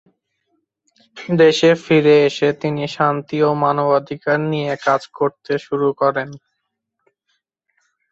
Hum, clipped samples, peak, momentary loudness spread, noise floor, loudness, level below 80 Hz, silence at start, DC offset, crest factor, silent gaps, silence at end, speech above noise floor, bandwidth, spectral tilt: none; under 0.1%; -2 dBFS; 10 LU; -75 dBFS; -17 LUFS; -62 dBFS; 1.15 s; under 0.1%; 16 dB; none; 1.75 s; 59 dB; 7.8 kHz; -6 dB/octave